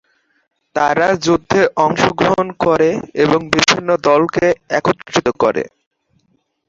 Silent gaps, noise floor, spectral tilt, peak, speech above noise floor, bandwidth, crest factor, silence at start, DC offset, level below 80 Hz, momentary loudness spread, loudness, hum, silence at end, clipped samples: none; -63 dBFS; -4.5 dB/octave; 0 dBFS; 48 dB; 8 kHz; 16 dB; 0.75 s; under 0.1%; -48 dBFS; 4 LU; -15 LUFS; none; 1 s; under 0.1%